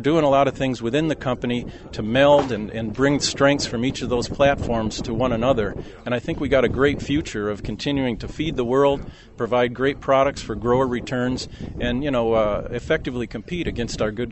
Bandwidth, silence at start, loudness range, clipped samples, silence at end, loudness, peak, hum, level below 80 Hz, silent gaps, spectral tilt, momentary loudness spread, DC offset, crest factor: 8.4 kHz; 0 s; 3 LU; under 0.1%; 0 s; -22 LUFS; -2 dBFS; none; -38 dBFS; none; -5.5 dB/octave; 10 LU; under 0.1%; 18 dB